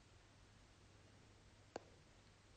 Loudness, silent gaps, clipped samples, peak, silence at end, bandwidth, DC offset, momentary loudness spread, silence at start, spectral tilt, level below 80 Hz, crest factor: -64 LUFS; none; under 0.1%; -34 dBFS; 0 s; 9.4 kHz; under 0.1%; 10 LU; 0 s; -4.5 dB/octave; -74 dBFS; 30 dB